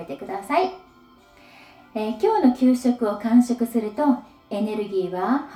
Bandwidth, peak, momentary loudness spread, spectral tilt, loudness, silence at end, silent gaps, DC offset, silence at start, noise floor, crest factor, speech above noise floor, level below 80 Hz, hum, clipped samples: 13.5 kHz; -6 dBFS; 11 LU; -6 dB/octave; -22 LUFS; 0 s; none; under 0.1%; 0 s; -52 dBFS; 16 dB; 31 dB; -62 dBFS; none; under 0.1%